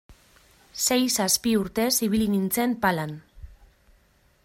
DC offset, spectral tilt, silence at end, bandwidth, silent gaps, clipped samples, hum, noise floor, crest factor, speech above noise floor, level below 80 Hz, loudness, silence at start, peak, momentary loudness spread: under 0.1%; -3.5 dB/octave; 1 s; 16 kHz; none; under 0.1%; none; -62 dBFS; 20 dB; 38 dB; -52 dBFS; -23 LUFS; 0.1 s; -6 dBFS; 10 LU